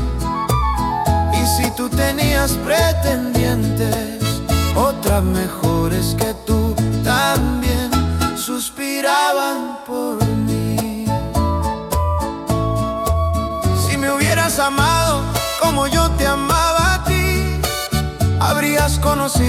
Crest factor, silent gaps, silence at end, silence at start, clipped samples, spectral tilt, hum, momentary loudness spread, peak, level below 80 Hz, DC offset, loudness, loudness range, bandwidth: 16 dB; none; 0 s; 0 s; under 0.1%; -5 dB/octave; none; 6 LU; -2 dBFS; -26 dBFS; under 0.1%; -18 LUFS; 3 LU; 17 kHz